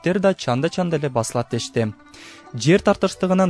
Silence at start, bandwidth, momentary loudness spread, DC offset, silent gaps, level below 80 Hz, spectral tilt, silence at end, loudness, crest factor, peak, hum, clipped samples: 0.05 s; 11 kHz; 18 LU; under 0.1%; none; -50 dBFS; -5.5 dB/octave; 0 s; -21 LUFS; 16 dB; -4 dBFS; none; under 0.1%